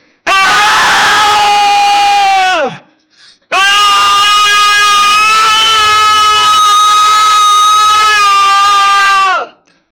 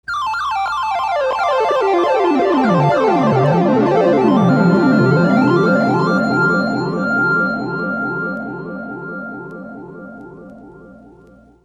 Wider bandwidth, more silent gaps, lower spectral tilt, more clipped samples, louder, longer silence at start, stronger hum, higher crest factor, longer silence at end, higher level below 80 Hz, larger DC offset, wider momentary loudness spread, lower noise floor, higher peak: first, over 20 kHz vs 10 kHz; neither; second, 1 dB/octave vs -7.5 dB/octave; neither; first, -6 LUFS vs -15 LUFS; first, 0.25 s vs 0.1 s; neither; second, 8 dB vs 14 dB; second, 0.5 s vs 0.7 s; first, -46 dBFS vs -52 dBFS; neither; second, 4 LU vs 15 LU; about the same, -43 dBFS vs -46 dBFS; about the same, 0 dBFS vs -2 dBFS